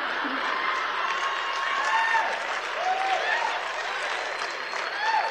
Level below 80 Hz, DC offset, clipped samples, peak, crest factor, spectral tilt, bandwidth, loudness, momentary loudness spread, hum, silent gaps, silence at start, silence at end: -64 dBFS; under 0.1%; under 0.1%; -12 dBFS; 16 dB; 0 dB/octave; 15 kHz; -26 LUFS; 6 LU; none; none; 0 s; 0 s